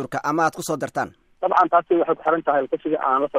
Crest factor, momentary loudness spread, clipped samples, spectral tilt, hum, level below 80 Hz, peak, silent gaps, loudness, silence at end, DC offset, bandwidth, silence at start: 16 dB; 9 LU; under 0.1%; -5.5 dB/octave; none; -64 dBFS; -4 dBFS; none; -21 LUFS; 0 s; under 0.1%; 16 kHz; 0 s